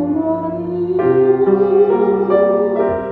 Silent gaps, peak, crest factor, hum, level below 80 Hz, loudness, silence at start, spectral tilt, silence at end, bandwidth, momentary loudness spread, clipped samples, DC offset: none; 0 dBFS; 14 dB; none; -50 dBFS; -15 LUFS; 0 s; -11 dB/octave; 0 s; 3.9 kHz; 7 LU; under 0.1%; under 0.1%